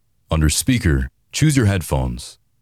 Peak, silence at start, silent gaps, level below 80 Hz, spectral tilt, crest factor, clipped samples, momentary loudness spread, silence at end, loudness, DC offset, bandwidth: -4 dBFS; 0.3 s; none; -28 dBFS; -5 dB/octave; 16 dB; under 0.1%; 11 LU; 0.3 s; -19 LUFS; under 0.1%; 15.5 kHz